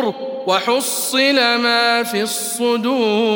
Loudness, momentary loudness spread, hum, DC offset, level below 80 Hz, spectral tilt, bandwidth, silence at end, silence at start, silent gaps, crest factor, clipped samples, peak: -16 LUFS; 6 LU; none; under 0.1%; -72 dBFS; -2 dB/octave; 18 kHz; 0 s; 0 s; none; 14 dB; under 0.1%; -2 dBFS